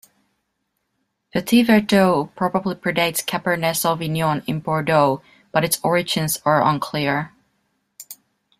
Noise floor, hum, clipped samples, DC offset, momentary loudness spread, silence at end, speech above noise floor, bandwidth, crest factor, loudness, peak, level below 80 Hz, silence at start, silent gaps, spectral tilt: -74 dBFS; none; under 0.1%; under 0.1%; 10 LU; 0.45 s; 55 dB; 16 kHz; 18 dB; -20 LUFS; -2 dBFS; -58 dBFS; 1.35 s; none; -4.5 dB/octave